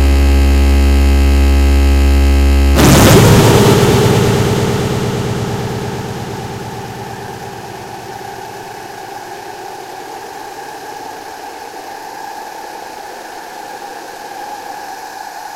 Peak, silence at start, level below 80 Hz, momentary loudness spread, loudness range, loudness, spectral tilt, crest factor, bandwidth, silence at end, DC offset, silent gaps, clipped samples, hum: 0 dBFS; 0 s; -16 dBFS; 20 LU; 19 LU; -11 LUFS; -5.5 dB/octave; 12 dB; 16.5 kHz; 0 s; under 0.1%; none; 0.2%; none